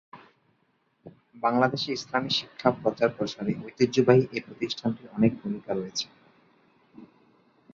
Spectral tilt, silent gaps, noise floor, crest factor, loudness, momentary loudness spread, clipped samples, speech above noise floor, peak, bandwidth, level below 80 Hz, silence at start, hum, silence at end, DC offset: -5.5 dB/octave; none; -70 dBFS; 24 dB; -27 LUFS; 11 LU; under 0.1%; 44 dB; -4 dBFS; 7.6 kHz; -64 dBFS; 0.15 s; none; 0.7 s; under 0.1%